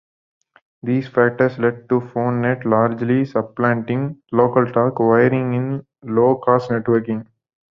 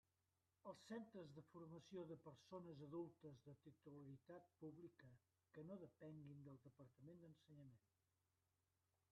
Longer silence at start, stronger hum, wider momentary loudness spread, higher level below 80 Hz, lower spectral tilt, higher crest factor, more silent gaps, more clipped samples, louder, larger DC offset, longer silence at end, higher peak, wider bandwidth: first, 0.85 s vs 0.65 s; neither; about the same, 8 LU vs 10 LU; first, -58 dBFS vs under -90 dBFS; first, -10 dB/octave vs -7.5 dB/octave; about the same, 16 dB vs 18 dB; neither; neither; first, -18 LUFS vs -61 LUFS; neither; second, 0.5 s vs 1.3 s; first, -2 dBFS vs -44 dBFS; second, 6 kHz vs 8.4 kHz